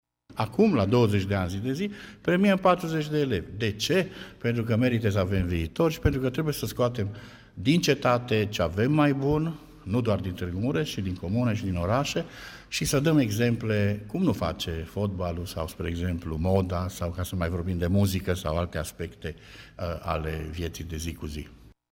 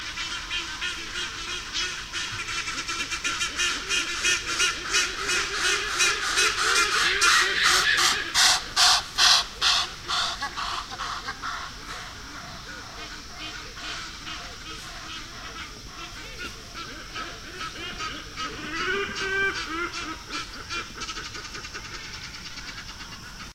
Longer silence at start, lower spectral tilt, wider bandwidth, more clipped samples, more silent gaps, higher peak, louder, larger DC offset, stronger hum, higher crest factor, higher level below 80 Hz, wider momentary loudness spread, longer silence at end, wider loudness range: first, 0.3 s vs 0 s; first, -6 dB/octave vs 0 dB/octave; about the same, 16.5 kHz vs 16 kHz; neither; neither; second, -10 dBFS vs -2 dBFS; second, -27 LUFS vs -24 LUFS; neither; neither; second, 16 dB vs 26 dB; about the same, -44 dBFS vs -48 dBFS; second, 12 LU vs 18 LU; first, 0.25 s vs 0 s; second, 4 LU vs 17 LU